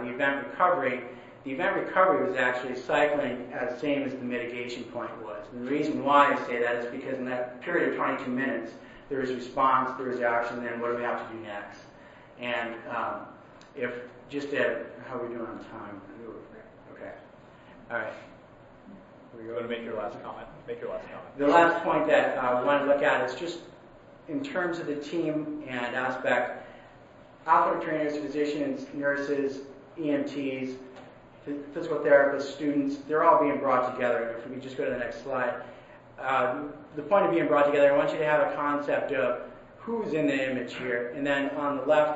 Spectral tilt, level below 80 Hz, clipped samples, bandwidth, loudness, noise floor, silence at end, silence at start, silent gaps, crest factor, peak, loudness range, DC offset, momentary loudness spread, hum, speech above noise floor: -6 dB/octave; -64 dBFS; under 0.1%; 8 kHz; -28 LUFS; -52 dBFS; 0 s; 0 s; none; 24 dB; -6 dBFS; 11 LU; under 0.1%; 18 LU; none; 24 dB